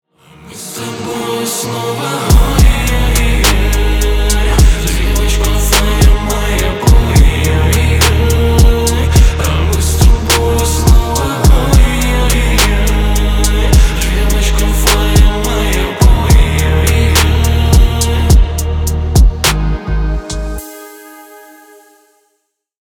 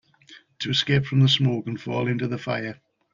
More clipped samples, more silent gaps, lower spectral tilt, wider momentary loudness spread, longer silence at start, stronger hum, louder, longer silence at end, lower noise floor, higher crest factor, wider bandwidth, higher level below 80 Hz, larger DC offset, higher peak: neither; neither; second, -4.5 dB/octave vs -6 dB/octave; second, 8 LU vs 11 LU; first, 0.45 s vs 0.3 s; neither; first, -12 LUFS vs -23 LUFS; first, 1.6 s vs 0.4 s; first, -66 dBFS vs -52 dBFS; second, 10 dB vs 18 dB; first, 18.5 kHz vs 7.4 kHz; first, -12 dBFS vs -58 dBFS; neither; first, 0 dBFS vs -6 dBFS